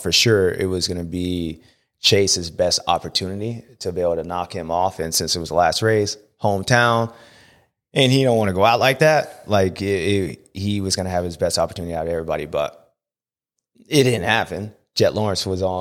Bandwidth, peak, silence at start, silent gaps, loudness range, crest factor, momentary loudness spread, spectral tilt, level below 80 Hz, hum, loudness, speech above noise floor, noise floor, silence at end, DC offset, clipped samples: 16.5 kHz; -2 dBFS; 0 s; none; 5 LU; 20 dB; 11 LU; -4 dB/octave; -48 dBFS; none; -20 LUFS; over 70 dB; under -90 dBFS; 0 s; under 0.1%; under 0.1%